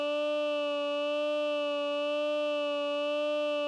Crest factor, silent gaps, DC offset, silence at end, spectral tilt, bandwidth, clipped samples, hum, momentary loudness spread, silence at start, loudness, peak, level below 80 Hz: 6 dB; none; under 0.1%; 0 s; -1 dB/octave; 10 kHz; under 0.1%; none; 1 LU; 0 s; -31 LUFS; -24 dBFS; under -90 dBFS